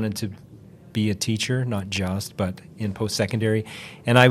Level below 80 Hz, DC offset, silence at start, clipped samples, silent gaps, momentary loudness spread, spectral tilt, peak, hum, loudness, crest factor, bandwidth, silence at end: -60 dBFS; under 0.1%; 0 s; under 0.1%; none; 9 LU; -5 dB/octave; 0 dBFS; none; -25 LUFS; 24 dB; 15.5 kHz; 0 s